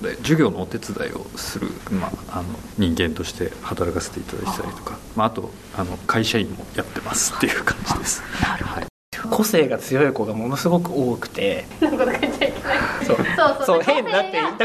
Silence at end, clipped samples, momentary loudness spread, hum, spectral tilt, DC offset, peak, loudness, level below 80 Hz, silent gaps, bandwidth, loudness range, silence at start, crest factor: 0 s; under 0.1%; 11 LU; none; -4.5 dB/octave; 0.1%; -4 dBFS; -22 LUFS; -44 dBFS; 8.90-9.12 s; 13.5 kHz; 6 LU; 0 s; 18 dB